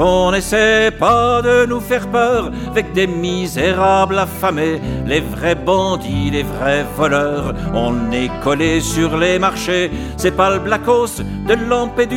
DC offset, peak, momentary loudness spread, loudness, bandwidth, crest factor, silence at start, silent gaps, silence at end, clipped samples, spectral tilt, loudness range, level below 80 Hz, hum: under 0.1%; 0 dBFS; 6 LU; -16 LUFS; 17 kHz; 14 dB; 0 s; none; 0 s; under 0.1%; -5 dB/octave; 3 LU; -32 dBFS; none